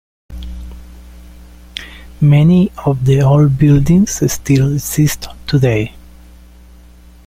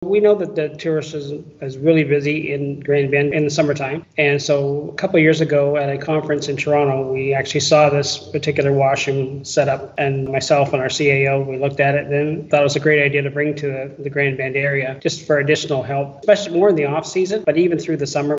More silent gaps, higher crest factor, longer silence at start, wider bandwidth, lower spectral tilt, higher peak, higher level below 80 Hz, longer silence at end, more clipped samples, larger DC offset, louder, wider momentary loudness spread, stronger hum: neither; about the same, 12 dB vs 16 dB; first, 0.3 s vs 0 s; first, 16 kHz vs 8 kHz; about the same, -6.5 dB/octave vs -5.5 dB/octave; about the same, -2 dBFS vs 0 dBFS; first, -32 dBFS vs -56 dBFS; first, 1.25 s vs 0 s; neither; neither; first, -12 LUFS vs -18 LUFS; first, 21 LU vs 8 LU; neither